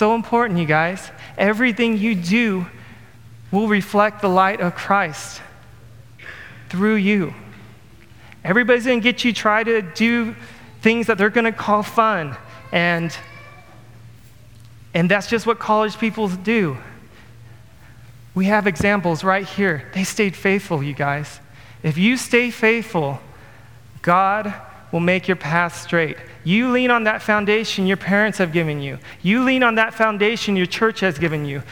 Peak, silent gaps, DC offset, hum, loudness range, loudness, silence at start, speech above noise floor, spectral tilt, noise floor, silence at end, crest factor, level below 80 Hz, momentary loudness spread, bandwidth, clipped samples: -2 dBFS; none; 0.4%; none; 4 LU; -19 LUFS; 0 s; 27 dB; -5.5 dB/octave; -46 dBFS; 0 s; 18 dB; -54 dBFS; 12 LU; 17.5 kHz; under 0.1%